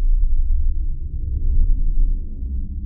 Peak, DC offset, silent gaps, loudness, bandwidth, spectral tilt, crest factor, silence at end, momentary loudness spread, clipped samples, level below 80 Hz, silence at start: -6 dBFS; under 0.1%; none; -25 LUFS; 0.5 kHz; -16 dB/octave; 12 dB; 0 s; 6 LU; under 0.1%; -16 dBFS; 0 s